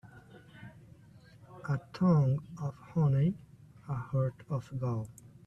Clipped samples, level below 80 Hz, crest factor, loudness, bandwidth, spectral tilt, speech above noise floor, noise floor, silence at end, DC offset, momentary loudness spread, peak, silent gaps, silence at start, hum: under 0.1%; -62 dBFS; 18 dB; -32 LUFS; 8.4 kHz; -9.5 dB/octave; 26 dB; -57 dBFS; 0.35 s; under 0.1%; 24 LU; -16 dBFS; none; 0.05 s; none